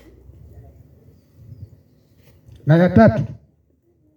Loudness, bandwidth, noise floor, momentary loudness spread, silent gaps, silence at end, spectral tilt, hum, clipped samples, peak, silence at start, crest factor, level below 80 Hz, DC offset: -16 LUFS; 6.6 kHz; -60 dBFS; 16 LU; none; 0.85 s; -10 dB/octave; none; under 0.1%; 0 dBFS; 1.5 s; 20 dB; -44 dBFS; under 0.1%